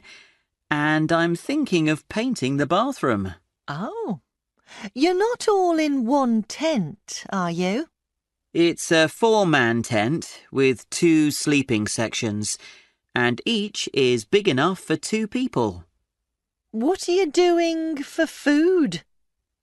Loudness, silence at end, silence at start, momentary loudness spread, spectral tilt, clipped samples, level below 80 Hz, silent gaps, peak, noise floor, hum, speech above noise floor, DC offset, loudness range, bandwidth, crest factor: -22 LUFS; 0.6 s; 0.1 s; 11 LU; -4.5 dB/octave; under 0.1%; -60 dBFS; none; -4 dBFS; -82 dBFS; none; 61 dB; under 0.1%; 4 LU; 12 kHz; 18 dB